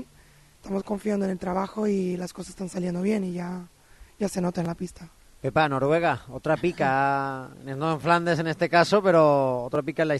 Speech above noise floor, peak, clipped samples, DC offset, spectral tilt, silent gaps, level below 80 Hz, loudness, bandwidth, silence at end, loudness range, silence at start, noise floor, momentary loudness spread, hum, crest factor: 30 dB; -6 dBFS; under 0.1%; under 0.1%; -6.5 dB/octave; none; -56 dBFS; -25 LUFS; 12.5 kHz; 0 s; 7 LU; 0 s; -55 dBFS; 14 LU; none; 18 dB